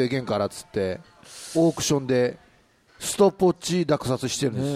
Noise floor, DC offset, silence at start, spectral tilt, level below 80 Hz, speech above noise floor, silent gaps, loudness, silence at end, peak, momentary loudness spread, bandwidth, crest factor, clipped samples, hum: -59 dBFS; under 0.1%; 0 s; -5 dB/octave; -56 dBFS; 35 dB; none; -24 LUFS; 0 s; -6 dBFS; 9 LU; 15.5 kHz; 18 dB; under 0.1%; none